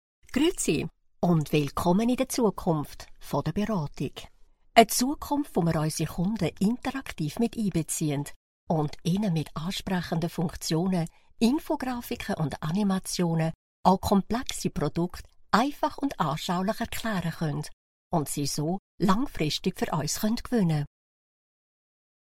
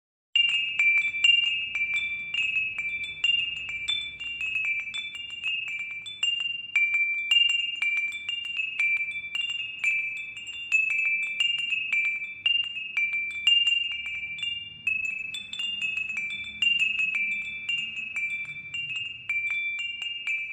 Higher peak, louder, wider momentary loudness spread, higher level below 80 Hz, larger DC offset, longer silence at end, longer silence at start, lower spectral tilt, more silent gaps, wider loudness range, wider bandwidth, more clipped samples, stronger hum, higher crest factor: first, -2 dBFS vs -10 dBFS; second, -28 LUFS vs -25 LUFS; about the same, 8 LU vs 10 LU; first, -48 dBFS vs -68 dBFS; neither; first, 1.5 s vs 0 s; about the same, 0.3 s vs 0.35 s; first, -5.5 dB/octave vs 1.5 dB/octave; first, 8.36-8.67 s, 13.55-13.83 s, 17.73-18.11 s, 18.79-18.98 s vs none; about the same, 3 LU vs 4 LU; first, 16.5 kHz vs 13.5 kHz; neither; neither; first, 26 dB vs 18 dB